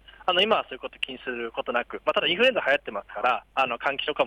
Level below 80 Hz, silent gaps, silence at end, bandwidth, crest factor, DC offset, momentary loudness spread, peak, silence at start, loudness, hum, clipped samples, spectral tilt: -60 dBFS; none; 0 s; 11.5 kHz; 16 dB; under 0.1%; 11 LU; -10 dBFS; 0.2 s; -25 LUFS; none; under 0.1%; -4 dB/octave